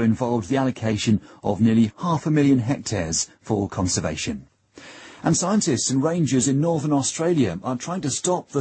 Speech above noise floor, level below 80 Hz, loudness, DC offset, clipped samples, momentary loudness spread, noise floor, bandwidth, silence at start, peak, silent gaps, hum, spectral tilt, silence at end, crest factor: 24 dB; -50 dBFS; -22 LUFS; under 0.1%; under 0.1%; 8 LU; -45 dBFS; 8.8 kHz; 0 s; -8 dBFS; none; none; -5 dB/octave; 0 s; 14 dB